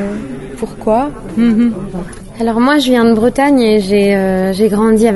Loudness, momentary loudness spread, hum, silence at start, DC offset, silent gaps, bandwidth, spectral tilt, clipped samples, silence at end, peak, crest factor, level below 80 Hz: -12 LUFS; 14 LU; none; 0 s; under 0.1%; none; 12 kHz; -6 dB/octave; under 0.1%; 0 s; 0 dBFS; 12 dB; -34 dBFS